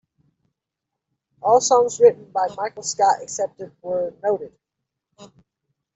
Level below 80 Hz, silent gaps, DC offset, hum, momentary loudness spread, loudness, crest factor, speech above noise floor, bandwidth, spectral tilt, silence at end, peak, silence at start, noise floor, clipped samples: -70 dBFS; none; under 0.1%; none; 12 LU; -20 LUFS; 20 dB; 64 dB; 8.2 kHz; -2.5 dB/octave; 0.7 s; -4 dBFS; 1.45 s; -83 dBFS; under 0.1%